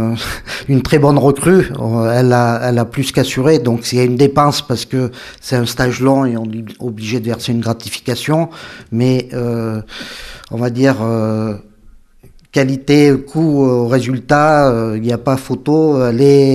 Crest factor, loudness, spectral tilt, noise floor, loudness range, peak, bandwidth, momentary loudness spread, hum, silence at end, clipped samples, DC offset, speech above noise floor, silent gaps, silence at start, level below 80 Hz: 14 dB; -14 LUFS; -6.5 dB/octave; -43 dBFS; 6 LU; 0 dBFS; 15 kHz; 12 LU; none; 0 s; under 0.1%; under 0.1%; 30 dB; none; 0 s; -40 dBFS